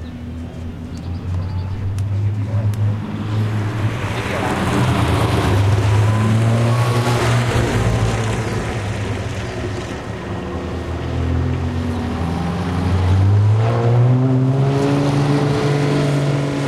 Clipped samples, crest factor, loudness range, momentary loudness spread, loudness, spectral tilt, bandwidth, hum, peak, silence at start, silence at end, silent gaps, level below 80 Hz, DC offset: under 0.1%; 14 dB; 7 LU; 10 LU; -18 LUFS; -7 dB/octave; 13 kHz; none; -4 dBFS; 0 s; 0 s; none; -34 dBFS; under 0.1%